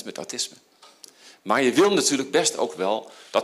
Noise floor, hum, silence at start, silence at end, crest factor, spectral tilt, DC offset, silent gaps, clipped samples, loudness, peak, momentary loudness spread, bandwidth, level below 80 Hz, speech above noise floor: -50 dBFS; none; 0 s; 0 s; 18 dB; -2.5 dB/octave; under 0.1%; none; under 0.1%; -23 LUFS; -6 dBFS; 12 LU; 15.5 kHz; -72 dBFS; 27 dB